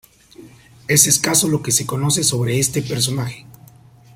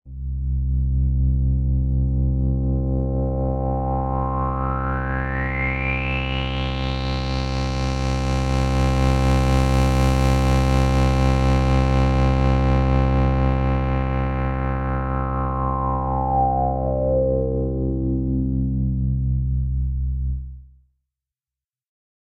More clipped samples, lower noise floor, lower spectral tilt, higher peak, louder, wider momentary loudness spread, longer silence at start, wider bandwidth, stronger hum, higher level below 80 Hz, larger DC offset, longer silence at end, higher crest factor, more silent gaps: neither; second, -46 dBFS vs under -90 dBFS; second, -3 dB/octave vs -7 dB/octave; first, 0 dBFS vs -6 dBFS; first, -16 LUFS vs -22 LUFS; first, 14 LU vs 6 LU; first, 0.4 s vs 0.05 s; first, 16.5 kHz vs 9.8 kHz; neither; second, -52 dBFS vs -24 dBFS; neither; second, 0.65 s vs 1.65 s; first, 20 dB vs 14 dB; neither